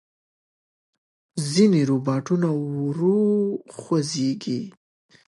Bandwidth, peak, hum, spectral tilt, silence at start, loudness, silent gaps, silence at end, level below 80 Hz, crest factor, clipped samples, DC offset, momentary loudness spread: 11.5 kHz; -6 dBFS; none; -6.5 dB/octave; 1.35 s; -22 LUFS; none; 0.55 s; -70 dBFS; 18 dB; under 0.1%; under 0.1%; 12 LU